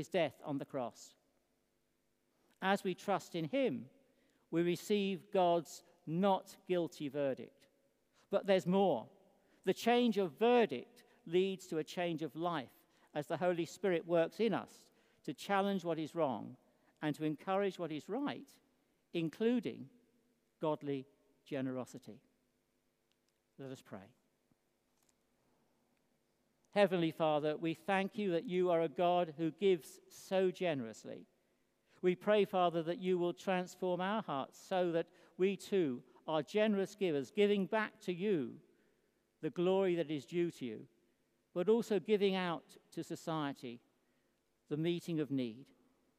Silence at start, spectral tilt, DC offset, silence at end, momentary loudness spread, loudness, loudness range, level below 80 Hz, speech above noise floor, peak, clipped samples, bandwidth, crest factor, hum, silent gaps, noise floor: 0 s; -6 dB/octave; under 0.1%; 0.55 s; 14 LU; -37 LUFS; 6 LU; -90 dBFS; 44 dB; -16 dBFS; under 0.1%; 15.5 kHz; 22 dB; none; none; -81 dBFS